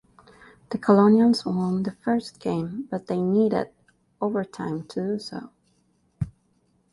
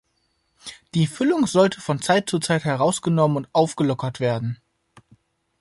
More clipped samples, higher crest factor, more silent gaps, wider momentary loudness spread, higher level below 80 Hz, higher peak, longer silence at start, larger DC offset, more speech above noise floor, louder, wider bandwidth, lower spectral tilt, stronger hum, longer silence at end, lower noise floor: neither; about the same, 20 dB vs 18 dB; neither; first, 16 LU vs 11 LU; about the same, -56 dBFS vs -60 dBFS; about the same, -6 dBFS vs -4 dBFS; about the same, 0.7 s vs 0.65 s; neither; second, 43 dB vs 49 dB; second, -24 LUFS vs -21 LUFS; about the same, 11.5 kHz vs 11.5 kHz; first, -7.5 dB/octave vs -5.5 dB/octave; neither; second, 0.65 s vs 1.05 s; about the same, -66 dBFS vs -69 dBFS